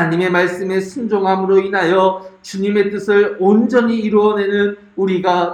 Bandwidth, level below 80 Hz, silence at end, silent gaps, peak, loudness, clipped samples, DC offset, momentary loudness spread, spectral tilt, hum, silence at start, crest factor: 9.4 kHz; -58 dBFS; 0 s; none; 0 dBFS; -15 LUFS; under 0.1%; under 0.1%; 7 LU; -6.5 dB/octave; none; 0 s; 14 dB